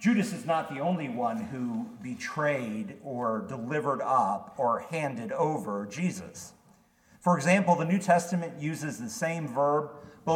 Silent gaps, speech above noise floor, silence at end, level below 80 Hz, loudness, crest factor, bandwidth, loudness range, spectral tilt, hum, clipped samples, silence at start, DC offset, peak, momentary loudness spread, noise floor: none; 33 dB; 0 s; -72 dBFS; -29 LUFS; 20 dB; 16 kHz; 4 LU; -6 dB/octave; none; under 0.1%; 0 s; under 0.1%; -10 dBFS; 12 LU; -62 dBFS